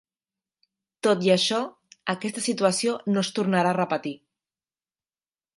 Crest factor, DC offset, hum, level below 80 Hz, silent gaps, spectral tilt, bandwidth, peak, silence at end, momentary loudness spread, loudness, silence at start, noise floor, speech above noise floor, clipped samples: 20 dB; under 0.1%; none; -74 dBFS; none; -4.5 dB/octave; 11.5 kHz; -6 dBFS; 1.4 s; 12 LU; -24 LUFS; 1.05 s; under -90 dBFS; over 66 dB; under 0.1%